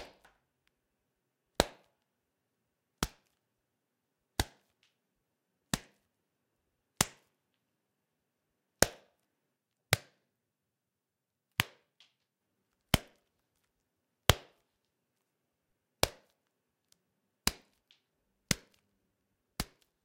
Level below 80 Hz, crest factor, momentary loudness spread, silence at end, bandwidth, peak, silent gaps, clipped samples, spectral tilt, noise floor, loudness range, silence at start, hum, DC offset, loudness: -52 dBFS; 40 dB; 12 LU; 0.4 s; 16 kHz; 0 dBFS; none; under 0.1%; -3 dB/octave; -88 dBFS; 7 LU; 0 s; none; under 0.1%; -35 LUFS